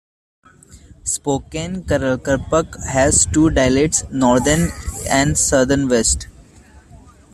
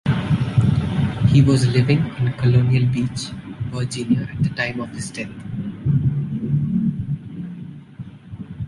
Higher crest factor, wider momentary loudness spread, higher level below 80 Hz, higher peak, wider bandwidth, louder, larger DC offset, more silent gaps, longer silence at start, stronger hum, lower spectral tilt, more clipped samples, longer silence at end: about the same, 16 dB vs 16 dB; second, 9 LU vs 17 LU; first, -34 dBFS vs -40 dBFS; about the same, -2 dBFS vs -4 dBFS; first, 14.5 kHz vs 11.5 kHz; first, -17 LUFS vs -20 LUFS; neither; neither; first, 0.75 s vs 0.05 s; neither; second, -4 dB/octave vs -7 dB/octave; neither; first, 0.4 s vs 0 s